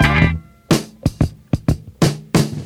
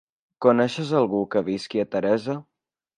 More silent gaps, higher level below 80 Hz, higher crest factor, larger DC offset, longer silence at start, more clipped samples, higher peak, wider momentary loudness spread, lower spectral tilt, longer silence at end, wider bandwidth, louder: neither; first, -28 dBFS vs -66 dBFS; about the same, 18 dB vs 20 dB; neither; second, 0 s vs 0.4 s; neither; first, 0 dBFS vs -4 dBFS; about the same, 6 LU vs 7 LU; about the same, -5.5 dB/octave vs -6.5 dB/octave; second, 0 s vs 0.55 s; first, 16.5 kHz vs 10.5 kHz; first, -19 LUFS vs -23 LUFS